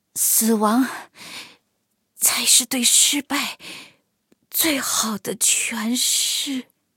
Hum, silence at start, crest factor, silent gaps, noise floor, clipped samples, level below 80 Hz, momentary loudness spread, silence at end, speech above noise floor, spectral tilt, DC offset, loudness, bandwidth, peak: none; 0.15 s; 20 dB; none; -72 dBFS; under 0.1%; -70 dBFS; 21 LU; 0.35 s; 51 dB; -0.5 dB/octave; under 0.1%; -18 LUFS; 17 kHz; -2 dBFS